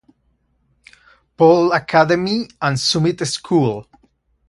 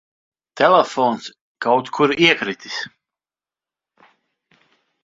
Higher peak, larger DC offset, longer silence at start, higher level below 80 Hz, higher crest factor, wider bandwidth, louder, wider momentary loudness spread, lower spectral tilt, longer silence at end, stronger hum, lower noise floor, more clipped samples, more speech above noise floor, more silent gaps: about the same, 0 dBFS vs 0 dBFS; neither; first, 1.4 s vs 0.55 s; first, -54 dBFS vs -66 dBFS; about the same, 18 dB vs 22 dB; first, 11.5 kHz vs 7.8 kHz; about the same, -16 LUFS vs -18 LUFS; second, 9 LU vs 14 LU; about the same, -5 dB/octave vs -4.5 dB/octave; second, 0.65 s vs 2.15 s; neither; second, -64 dBFS vs under -90 dBFS; neither; second, 48 dB vs over 73 dB; second, none vs 1.41-1.55 s